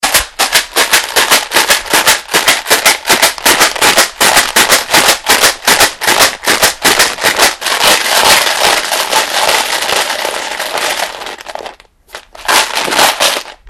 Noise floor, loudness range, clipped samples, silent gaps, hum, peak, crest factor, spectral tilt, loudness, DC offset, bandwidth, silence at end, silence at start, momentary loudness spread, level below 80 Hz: -34 dBFS; 6 LU; 1%; none; none; 0 dBFS; 10 dB; 0.5 dB/octave; -8 LUFS; under 0.1%; over 20 kHz; 0 s; 0 s; 8 LU; -40 dBFS